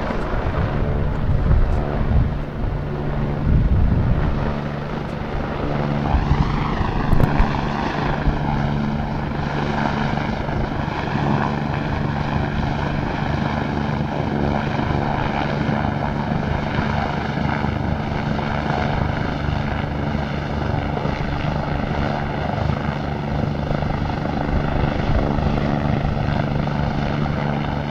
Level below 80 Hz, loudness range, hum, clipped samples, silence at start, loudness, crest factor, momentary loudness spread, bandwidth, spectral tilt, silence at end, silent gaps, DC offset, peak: -26 dBFS; 2 LU; none; under 0.1%; 0 s; -22 LUFS; 16 dB; 4 LU; 7.2 kHz; -8 dB/octave; 0 s; none; under 0.1%; -4 dBFS